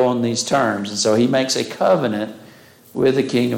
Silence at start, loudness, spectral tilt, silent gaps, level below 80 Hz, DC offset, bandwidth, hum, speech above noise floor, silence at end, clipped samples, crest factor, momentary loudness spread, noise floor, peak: 0 s; -18 LUFS; -4.5 dB/octave; none; -62 dBFS; under 0.1%; 17 kHz; none; 27 dB; 0 s; under 0.1%; 12 dB; 7 LU; -45 dBFS; -6 dBFS